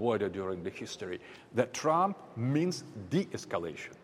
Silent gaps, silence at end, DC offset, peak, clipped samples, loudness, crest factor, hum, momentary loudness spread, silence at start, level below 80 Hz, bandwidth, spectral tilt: none; 0.05 s; under 0.1%; -14 dBFS; under 0.1%; -34 LUFS; 20 dB; none; 12 LU; 0 s; -70 dBFS; 15.5 kHz; -6 dB/octave